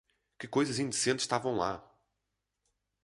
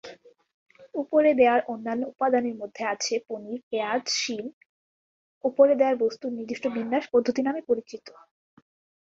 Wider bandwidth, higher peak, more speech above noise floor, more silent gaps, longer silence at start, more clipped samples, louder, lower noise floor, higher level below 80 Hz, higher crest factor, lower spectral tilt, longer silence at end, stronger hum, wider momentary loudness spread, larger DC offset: first, 11.5 kHz vs 7.8 kHz; second, -14 dBFS vs -6 dBFS; first, 53 dB vs 22 dB; second, none vs 0.54-0.66 s, 3.63-3.71 s, 4.53-5.41 s; first, 0.4 s vs 0.05 s; neither; second, -32 LUFS vs -25 LUFS; first, -85 dBFS vs -47 dBFS; about the same, -68 dBFS vs -72 dBFS; about the same, 22 dB vs 20 dB; about the same, -3.5 dB/octave vs -3 dB/octave; first, 1.25 s vs 1 s; neither; second, 10 LU vs 15 LU; neither